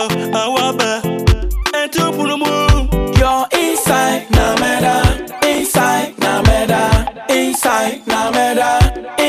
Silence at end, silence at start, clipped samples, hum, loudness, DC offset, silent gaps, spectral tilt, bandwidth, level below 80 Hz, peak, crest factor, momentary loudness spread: 0 s; 0 s; under 0.1%; none; -14 LUFS; under 0.1%; none; -4.5 dB/octave; 15.5 kHz; -22 dBFS; 0 dBFS; 14 dB; 4 LU